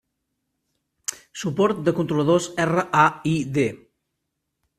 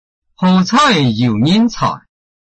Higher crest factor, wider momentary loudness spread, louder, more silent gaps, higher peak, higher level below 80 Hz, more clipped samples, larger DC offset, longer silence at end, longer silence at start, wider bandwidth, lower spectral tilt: first, 22 dB vs 12 dB; first, 13 LU vs 9 LU; second, -22 LUFS vs -13 LUFS; neither; about the same, -2 dBFS vs -2 dBFS; second, -60 dBFS vs -44 dBFS; neither; neither; first, 1.05 s vs 0.45 s; first, 1.1 s vs 0.4 s; first, 14.5 kHz vs 8.6 kHz; about the same, -5.5 dB/octave vs -5.5 dB/octave